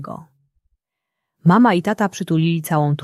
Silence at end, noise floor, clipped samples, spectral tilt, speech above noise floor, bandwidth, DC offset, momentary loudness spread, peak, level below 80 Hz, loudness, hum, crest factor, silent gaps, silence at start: 0 s; -81 dBFS; under 0.1%; -7 dB/octave; 64 dB; 13.5 kHz; under 0.1%; 12 LU; -2 dBFS; -62 dBFS; -17 LUFS; none; 18 dB; none; 0 s